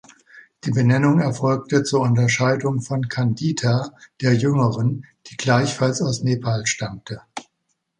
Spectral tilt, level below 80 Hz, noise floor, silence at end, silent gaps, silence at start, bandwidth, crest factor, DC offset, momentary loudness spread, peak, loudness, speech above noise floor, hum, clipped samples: -5.5 dB/octave; -56 dBFS; -73 dBFS; 0.55 s; none; 0.35 s; 10 kHz; 18 dB; under 0.1%; 15 LU; -2 dBFS; -20 LUFS; 54 dB; none; under 0.1%